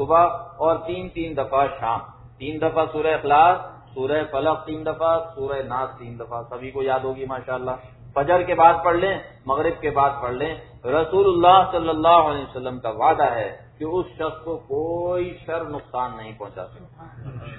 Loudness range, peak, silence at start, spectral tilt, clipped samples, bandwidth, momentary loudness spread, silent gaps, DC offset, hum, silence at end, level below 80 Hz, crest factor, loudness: 9 LU; 0 dBFS; 0 s; -9.5 dB/octave; under 0.1%; 4.1 kHz; 17 LU; none; under 0.1%; none; 0 s; -48 dBFS; 22 dB; -21 LUFS